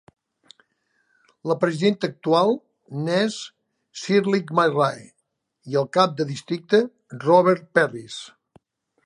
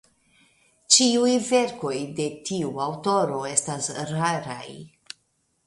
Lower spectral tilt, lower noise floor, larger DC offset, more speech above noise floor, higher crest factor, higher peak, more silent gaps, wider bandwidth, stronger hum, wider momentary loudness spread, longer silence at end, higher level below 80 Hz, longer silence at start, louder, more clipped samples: first, -5.5 dB/octave vs -3 dB/octave; about the same, -69 dBFS vs -70 dBFS; neither; about the same, 48 dB vs 46 dB; about the same, 20 dB vs 22 dB; about the same, -2 dBFS vs -4 dBFS; neither; about the same, 11.5 kHz vs 11.5 kHz; neither; second, 17 LU vs 24 LU; about the same, 0.8 s vs 0.8 s; second, -72 dBFS vs -66 dBFS; first, 1.45 s vs 0.9 s; about the same, -21 LUFS vs -23 LUFS; neither